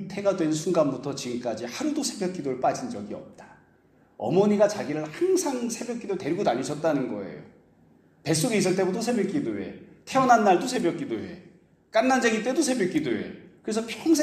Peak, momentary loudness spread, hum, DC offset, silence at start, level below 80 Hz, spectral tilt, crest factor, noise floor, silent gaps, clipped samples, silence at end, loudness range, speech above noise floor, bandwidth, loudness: -6 dBFS; 14 LU; none; under 0.1%; 0 s; -68 dBFS; -4.5 dB/octave; 20 dB; -60 dBFS; none; under 0.1%; 0 s; 5 LU; 35 dB; 15 kHz; -26 LUFS